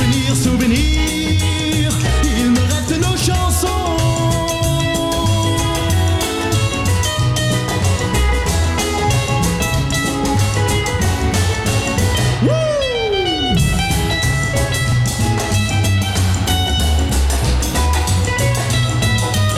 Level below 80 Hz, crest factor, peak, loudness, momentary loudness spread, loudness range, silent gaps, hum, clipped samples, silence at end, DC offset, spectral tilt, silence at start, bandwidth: -24 dBFS; 12 dB; -2 dBFS; -16 LUFS; 2 LU; 1 LU; none; none; under 0.1%; 0 s; under 0.1%; -4.5 dB/octave; 0 s; 15.5 kHz